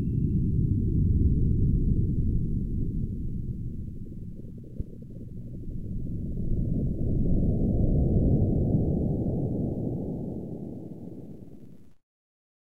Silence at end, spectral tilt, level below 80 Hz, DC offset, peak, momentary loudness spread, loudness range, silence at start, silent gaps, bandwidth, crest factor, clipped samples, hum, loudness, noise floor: 0.7 s; -13.5 dB/octave; -32 dBFS; 0.5%; -12 dBFS; 17 LU; 10 LU; 0 s; none; 0.9 kHz; 16 dB; under 0.1%; none; -28 LUFS; -50 dBFS